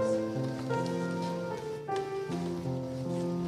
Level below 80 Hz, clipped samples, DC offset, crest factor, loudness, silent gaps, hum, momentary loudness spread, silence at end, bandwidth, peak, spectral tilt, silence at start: -64 dBFS; under 0.1%; under 0.1%; 14 dB; -34 LUFS; none; none; 4 LU; 0 s; 14 kHz; -20 dBFS; -7 dB/octave; 0 s